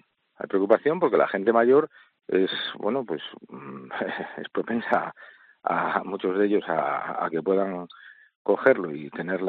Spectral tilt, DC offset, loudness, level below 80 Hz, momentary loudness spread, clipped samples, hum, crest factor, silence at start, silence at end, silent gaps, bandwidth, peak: -3.5 dB/octave; under 0.1%; -25 LUFS; -74 dBFS; 15 LU; under 0.1%; none; 20 dB; 0.4 s; 0 s; 8.35-8.45 s; 4.7 kHz; -4 dBFS